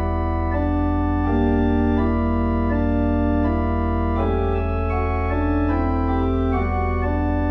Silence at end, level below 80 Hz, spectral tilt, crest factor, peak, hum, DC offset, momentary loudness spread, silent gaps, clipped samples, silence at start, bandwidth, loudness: 0 s; -26 dBFS; -10.5 dB/octave; 12 dB; -8 dBFS; none; under 0.1%; 3 LU; none; under 0.1%; 0 s; 4.7 kHz; -21 LUFS